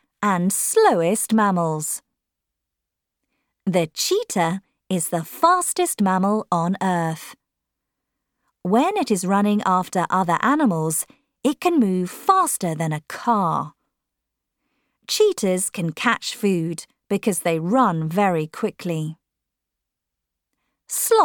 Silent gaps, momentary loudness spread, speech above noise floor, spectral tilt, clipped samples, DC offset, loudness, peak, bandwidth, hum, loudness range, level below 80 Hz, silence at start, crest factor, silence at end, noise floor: none; 9 LU; 63 dB; -4.5 dB/octave; under 0.1%; under 0.1%; -21 LUFS; -4 dBFS; 19 kHz; none; 4 LU; -72 dBFS; 0.2 s; 18 dB; 0 s; -83 dBFS